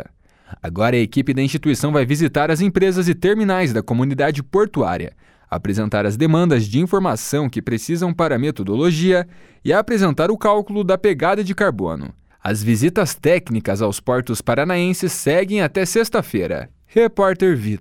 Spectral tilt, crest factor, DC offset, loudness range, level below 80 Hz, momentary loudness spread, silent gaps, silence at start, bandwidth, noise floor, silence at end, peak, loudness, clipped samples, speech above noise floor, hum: -6 dB/octave; 16 dB; under 0.1%; 2 LU; -46 dBFS; 7 LU; none; 0 s; 17.5 kHz; -46 dBFS; 0 s; -2 dBFS; -18 LUFS; under 0.1%; 29 dB; none